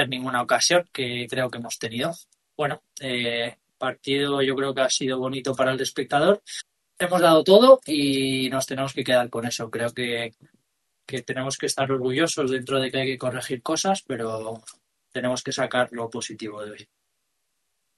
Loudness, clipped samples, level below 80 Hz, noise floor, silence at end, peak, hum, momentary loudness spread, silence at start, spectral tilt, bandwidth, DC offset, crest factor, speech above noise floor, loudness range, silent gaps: -23 LUFS; under 0.1%; -68 dBFS; -77 dBFS; 1.15 s; -2 dBFS; none; 14 LU; 0 s; -3.5 dB/octave; 12.5 kHz; under 0.1%; 22 dB; 53 dB; 9 LU; none